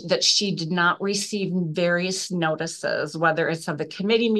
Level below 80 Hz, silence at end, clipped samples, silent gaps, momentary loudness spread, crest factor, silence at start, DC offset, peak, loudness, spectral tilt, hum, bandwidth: -72 dBFS; 0 s; under 0.1%; none; 8 LU; 18 dB; 0 s; under 0.1%; -6 dBFS; -23 LUFS; -3.5 dB/octave; none; 12.5 kHz